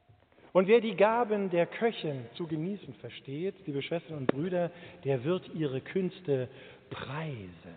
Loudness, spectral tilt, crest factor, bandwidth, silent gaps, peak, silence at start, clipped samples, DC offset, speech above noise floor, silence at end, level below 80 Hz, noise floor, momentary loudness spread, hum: -31 LUFS; -5.5 dB/octave; 22 dB; 4.6 kHz; none; -8 dBFS; 0.55 s; under 0.1%; under 0.1%; 29 dB; 0 s; -72 dBFS; -60 dBFS; 16 LU; none